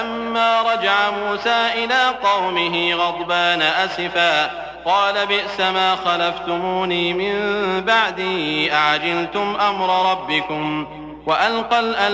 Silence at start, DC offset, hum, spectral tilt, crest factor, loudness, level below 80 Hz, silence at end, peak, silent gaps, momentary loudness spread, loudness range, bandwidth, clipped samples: 0 s; under 0.1%; none; -4 dB/octave; 14 dB; -18 LUFS; -54 dBFS; 0 s; -4 dBFS; none; 5 LU; 2 LU; 8 kHz; under 0.1%